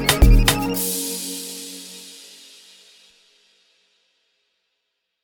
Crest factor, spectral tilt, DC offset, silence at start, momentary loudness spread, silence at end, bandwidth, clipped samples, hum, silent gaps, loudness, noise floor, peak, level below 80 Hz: 22 dB; -3.5 dB/octave; under 0.1%; 0 s; 26 LU; 3.1 s; over 20 kHz; under 0.1%; none; none; -20 LUFS; -76 dBFS; 0 dBFS; -24 dBFS